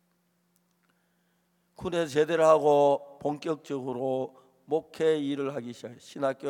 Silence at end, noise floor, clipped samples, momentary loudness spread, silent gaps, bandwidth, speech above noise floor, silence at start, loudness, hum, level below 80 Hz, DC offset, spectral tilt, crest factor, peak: 0 s; -72 dBFS; under 0.1%; 17 LU; none; 14.5 kHz; 45 dB; 1.8 s; -27 LUFS; none; -68 dBFS; under 0.1%; -5.5 dB/octave; 20 dB; -8 dBFS